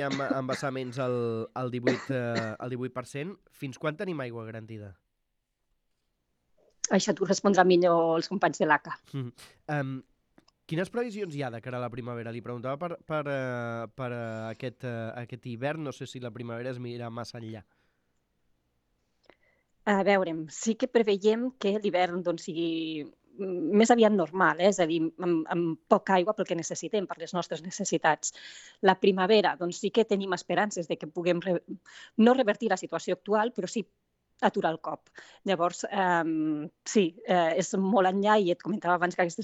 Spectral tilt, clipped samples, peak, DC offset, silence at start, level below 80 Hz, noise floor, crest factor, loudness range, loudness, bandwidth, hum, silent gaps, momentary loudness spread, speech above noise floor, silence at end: -5 dB/octave; under 0.1%; -6 dBFS; under 0.1%; 0 s; -72 dBFS; -80 dBFS; 24 dB; 11 LU; -28 LUFS; 11 kHz; none; none; 15 LU; 51 dB; 0 s